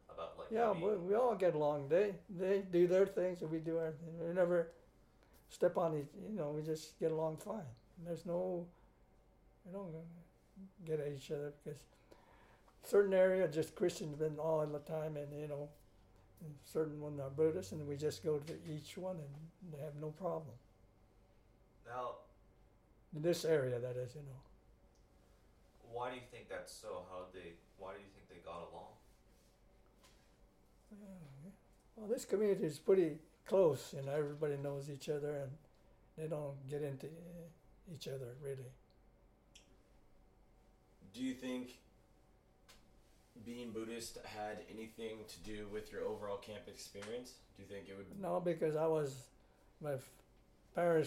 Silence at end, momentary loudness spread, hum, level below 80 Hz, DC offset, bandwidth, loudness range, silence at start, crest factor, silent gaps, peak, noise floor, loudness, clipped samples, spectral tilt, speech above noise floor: 0 s; 20 LU; none; -70 dBFS; under 0.1%; 16.5 kHz; 14 LU; 0.1 s; 20 dB; none; -20 dBFS; -69 dBFS; -40 LUFS; under 0.1%; -6.5 dB/octave; 30 dB